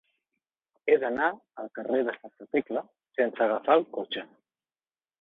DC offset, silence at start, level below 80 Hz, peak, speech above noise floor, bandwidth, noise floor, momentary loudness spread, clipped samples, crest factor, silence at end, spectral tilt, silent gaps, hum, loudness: under 0.1%; 0.85 s; -76 dBFS; -8 dBFS; over 62 dB; 4.2 kHz; under -90 dBFS; 13 LU; under 0.1%; 20 dB; 0.95 s; -7 dB/octave; none; none; -28 LUFS